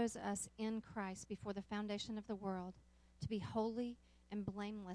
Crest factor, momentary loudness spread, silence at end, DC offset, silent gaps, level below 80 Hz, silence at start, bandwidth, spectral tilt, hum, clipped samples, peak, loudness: 16 dB; 7 LU; 0 s; under 0.1%; none; -68 dBFS; 0 s; 11 kHz; -5 dB/octave; none; under 0.1%; -28 dBFS; -45 LUFS